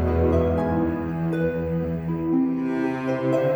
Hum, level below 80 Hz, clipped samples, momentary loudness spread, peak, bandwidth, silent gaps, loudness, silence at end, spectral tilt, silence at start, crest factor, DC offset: none; -36 dBFS; under 0.1%; 5 LU; -10 dBFS; over 20 kHz; none; -24 LUFS; 0 s; -9.5 dB/octave; 0 s; 14 dB; under 0.1%